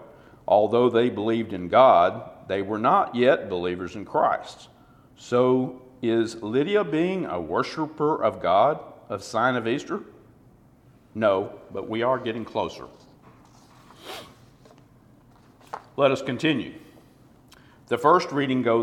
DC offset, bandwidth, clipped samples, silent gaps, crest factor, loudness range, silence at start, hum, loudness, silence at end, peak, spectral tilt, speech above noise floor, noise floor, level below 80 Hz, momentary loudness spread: under 0.1%; 13.5 kHz; under 0.1%; none; 22 dB; 10 LU; 0 s; none; -23 LUFS; 0 s; -4 dBFS; -6 dB/octave; 32 dB; -55 dBFS; -62 dBFS; 16 LU